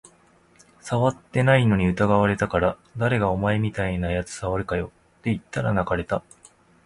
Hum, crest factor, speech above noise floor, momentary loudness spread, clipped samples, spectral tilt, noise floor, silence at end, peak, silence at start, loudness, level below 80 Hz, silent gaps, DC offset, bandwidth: none; 20 dB; 35 dB; 10 LU; under 0.1%; -7 dB/octave; -57 dBFS; 0.65 s; -4 dBFS; 0.85 s; -23 LUFS; -42 dBFS; none; under 0.1%; 11.5 kHz